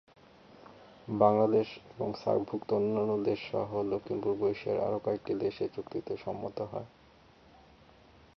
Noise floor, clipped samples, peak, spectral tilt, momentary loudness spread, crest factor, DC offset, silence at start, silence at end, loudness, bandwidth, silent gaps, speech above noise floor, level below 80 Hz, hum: -59 dBFS; under 0.1%; -10 dBFS; -8.5 dB/octave; 12 LU; 22 dB; under 0.1%; 0.6 s; 1.5 s; -32 LUFS; 6.2 kHz; none; 28 dB; -66 dBFS; none